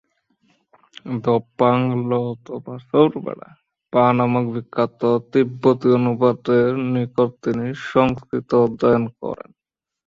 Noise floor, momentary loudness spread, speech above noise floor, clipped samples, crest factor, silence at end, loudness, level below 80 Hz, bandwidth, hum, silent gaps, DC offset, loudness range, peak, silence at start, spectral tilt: -64 dBFS; 13 LU; 45 dB; under 0.1%; 18 dB; 0.7 s; -19 LUFS; -56 dBFS; 7.2 kHz; none; none; under 0.1%; 3 LU; -2 dBFS; 1.05 s; -9 dB/octave